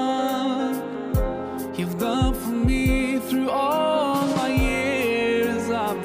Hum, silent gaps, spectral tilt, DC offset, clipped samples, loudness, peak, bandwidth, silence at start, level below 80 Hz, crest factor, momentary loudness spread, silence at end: none; none; -6 dB/octave; under 0.1%; under 0.1%; -23 LUFS; -10 dBFS; 16 kHz; 0 s; -32 dBFS; 14 dB; 6 LU; 0 s